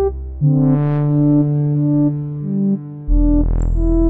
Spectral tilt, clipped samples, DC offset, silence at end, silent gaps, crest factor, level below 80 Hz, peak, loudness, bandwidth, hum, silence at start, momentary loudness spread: -13 dB/octave; under 0.1%; under 0.1%; 0 s; none; 10 dB; -20 dBFS; -6 dBFS; -17 LUFS; 7.8 kHz; none; 0 s; 8 LU